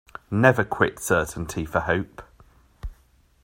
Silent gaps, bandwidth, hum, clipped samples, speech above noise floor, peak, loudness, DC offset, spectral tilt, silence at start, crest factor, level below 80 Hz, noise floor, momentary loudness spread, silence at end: none; 16 kHz; none; under 0.1%; 36 dB; -2 dBFS; -23 LUFS; under 0.1%; -5.5 dB/octave; 0.3 s; 24 dB; -44 dBFS; -59 dBFS; 23 LU; 0.5 s